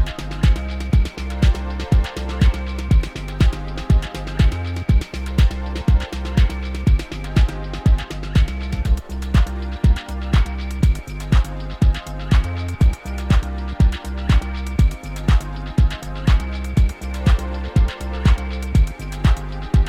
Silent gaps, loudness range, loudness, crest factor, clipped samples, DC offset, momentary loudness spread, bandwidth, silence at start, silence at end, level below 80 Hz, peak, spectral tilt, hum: none; 1 LU; -21 LUFS; 14 dB; under 0.1%; under 0.1%; 5 LU; 11 kHz; 0 s; 0 s; -20 dBFS; -4 dBFS; -6.5 dB/octave; none